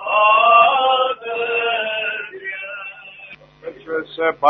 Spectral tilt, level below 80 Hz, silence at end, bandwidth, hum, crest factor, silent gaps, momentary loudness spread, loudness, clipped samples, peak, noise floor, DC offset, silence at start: -5 dB/octave; -66 dBFS; 0 s; 4.5 kHz; none; 18 dB; none; 24 LU; -17 LUFS; under 0.1%; 0 dBFS; -41 dBFS; under 0.1%; 0 s